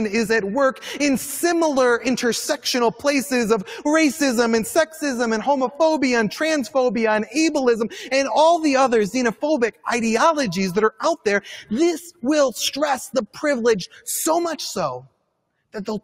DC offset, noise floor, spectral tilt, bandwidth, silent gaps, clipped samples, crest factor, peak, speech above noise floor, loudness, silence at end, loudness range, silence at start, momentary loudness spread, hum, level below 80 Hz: under 0.1%; -71 dBFS; -3.5 dB/octave; 16 kHz; none; under 0.1%; 16 dB; -4 dBFS; 51 dB; -20 LUFS; 0.05 s; 3 LU; 0 s; 6 LU; none; -58 dBFS